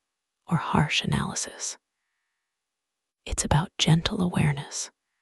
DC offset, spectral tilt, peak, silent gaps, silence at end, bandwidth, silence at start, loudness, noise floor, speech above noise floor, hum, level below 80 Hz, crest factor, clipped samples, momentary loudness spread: under 0.1%; -4 dB/octave; -6 dBFS; none; 0.3 s; 12 kHz; 0.5 s; -26 LUFS; -85 dBFS; 60 dB; none; -44 dBFS; 22 dB; under 0.1%; 11 LU